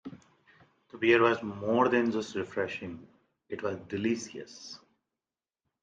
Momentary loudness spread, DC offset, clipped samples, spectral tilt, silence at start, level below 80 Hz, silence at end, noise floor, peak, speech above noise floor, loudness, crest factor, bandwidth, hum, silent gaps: 21 LU; under 0.1%; under 0.1%; -5 dB/octave; 0.05 s; -74 dBFS; 1.05 s; under -90 dBFS; -10 dBFS; over 61 dB; -29 LUFS; 22 dB; 7.6 kHz; none; none